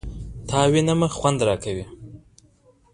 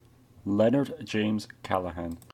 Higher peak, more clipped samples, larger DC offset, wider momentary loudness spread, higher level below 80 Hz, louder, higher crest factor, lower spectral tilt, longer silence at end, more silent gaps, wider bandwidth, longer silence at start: first, -4 dBFS vs -10 dBFS; neither; neither; first, 18 LU vs 12 LU; first, -42 dBFS vs -56 dBFS; first, -21 LUFS vs -29 LUFS; about the same, 20 dB vs 20 dB; about the same, -5.5 dB/octave vs -6.5 dB/octave; first, 0.75 s vs 0.15 s; neither; second, 11 kHz vs 14 kHz; second, 0.05 s vs 0.45 s